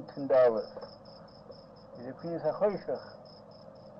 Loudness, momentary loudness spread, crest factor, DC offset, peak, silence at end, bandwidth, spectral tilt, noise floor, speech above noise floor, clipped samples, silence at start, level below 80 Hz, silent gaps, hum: -30 LUFS; 26 LU; 18 dB; under 0.1%; -14 dBFS; 0 s; 5.8 kHz; -8.5 dB/octave; -51 dBFS; 21 dB; under 0.1%; 0 s; -70 dBFS; none; none